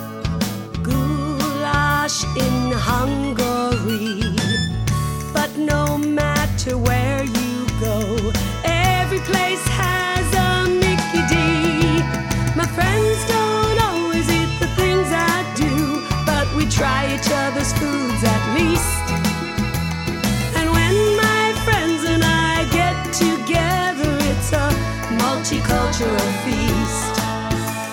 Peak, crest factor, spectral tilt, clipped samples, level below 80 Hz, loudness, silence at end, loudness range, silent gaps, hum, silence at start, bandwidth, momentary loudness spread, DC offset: -2 dBFS; 16 dB; -4.5 dB/octave; under 0.1%; -30 dBFS; -19 LUFS; 0 s; 3 LU; none; none; 0 s; 19 kHz; 5 LU; under 0.1%